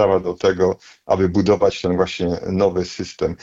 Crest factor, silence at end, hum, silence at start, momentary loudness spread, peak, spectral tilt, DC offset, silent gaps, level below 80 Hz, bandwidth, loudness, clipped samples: 14 dB; 0.05 s; none; 0 s; 8 LU; -4 dBFS; -6.5 dB/octave; under 0.1%; none; -48 dBFS; 7.8 kHz; -19 LUFS; under 0.1%